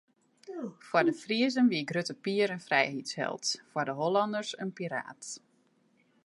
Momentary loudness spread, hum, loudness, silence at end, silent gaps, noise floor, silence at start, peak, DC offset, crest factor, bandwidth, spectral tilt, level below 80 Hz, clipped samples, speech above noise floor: 14 LU; none; -31 LUFS; 0.85 s; none; -69 dBFS; 0.45 s; -10 dBFS; under 0.1%; 22 dB; 11.5 kHz; -4 dB/octave; -84 dBFS; under 0.1%; 38 dB